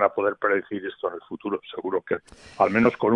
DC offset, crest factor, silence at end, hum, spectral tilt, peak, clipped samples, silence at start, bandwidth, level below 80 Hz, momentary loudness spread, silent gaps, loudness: under 0.1%; 20 dB; 0 s; none; -7 dB/octave; -4 dBFS; under 0.1%; 0 s; 10 kHz; -62 dBFS; 12 LU; none; -25 LUFS